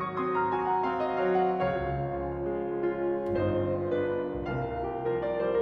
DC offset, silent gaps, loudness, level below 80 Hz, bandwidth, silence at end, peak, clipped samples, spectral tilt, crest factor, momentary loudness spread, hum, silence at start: under 0.1%; none; -30 LUFS; -50 dBFS; 5.4 kHz; 0 s; -16 dBFS; under 0.1%; -9.5 dB/octave; 12 dB; 6 LU; none; 0 s